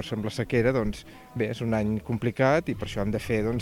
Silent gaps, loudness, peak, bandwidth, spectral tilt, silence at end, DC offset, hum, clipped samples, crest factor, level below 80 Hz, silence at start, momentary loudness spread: none; -27 LUFS; -10 dBFS; 16.5 kHz; -7 dB/octave; 0 s; under 0.1%; none; under 0.1%; 16 dB; -44 dBFS; 0 s; 8 LU